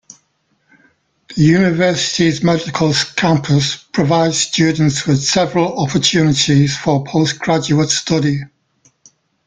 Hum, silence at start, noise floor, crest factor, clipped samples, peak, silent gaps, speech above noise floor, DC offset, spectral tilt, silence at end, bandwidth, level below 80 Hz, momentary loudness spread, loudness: none; 1.3 s; -63 dBFS; 14 dB; under 0.1%; 0 dBFS; none; 49 dB; under 0.1%; -4.5 dB/octave; 1 s; 9.4 kHz; -48 dBFS; 4 LU; -14 LUFS